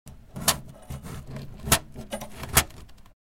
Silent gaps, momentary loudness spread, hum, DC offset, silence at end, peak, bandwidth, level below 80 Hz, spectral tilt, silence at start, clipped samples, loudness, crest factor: none; 18 LU; none; 0.1%; 0.25 s; 0 dBFS; 16.5 kHz; -42 dBFS; -2 dB/octave; 0.05 s; under 0.1%; -26 LUFS; 30 dB